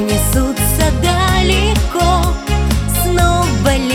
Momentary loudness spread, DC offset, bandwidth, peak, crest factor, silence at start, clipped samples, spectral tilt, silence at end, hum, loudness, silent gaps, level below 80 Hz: 3 LU; under 0.1%; 18 kHz; 0 dBFS; 12 dB; 0 s; under 0.1%; -4.5 dB/octave; 0 s; none; -14 LUFS; none; -18 dBFS